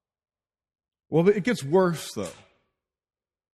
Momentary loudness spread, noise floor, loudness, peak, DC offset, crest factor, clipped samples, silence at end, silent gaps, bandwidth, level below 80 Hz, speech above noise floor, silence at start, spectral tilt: 13 LU; -80 dBFS; -24 LUFS; -8 dBFS; under 0.1%; 20 dB; under 0.1%; 1.2 s; none; 13.5 kHz; -66 dBFS; 56 dB; 1.1 s; -6 dB/octave